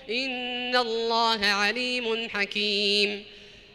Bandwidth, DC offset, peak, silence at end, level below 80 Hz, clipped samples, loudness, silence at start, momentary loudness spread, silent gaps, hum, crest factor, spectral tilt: 15.5 kHz; under 0.1%; -10 dBFS; 0.15 s; -62 dBFS; under 0.1%; -25 LUFS; 0 s; 7 LU; none; none; 16 dB; -2.5 dB/octave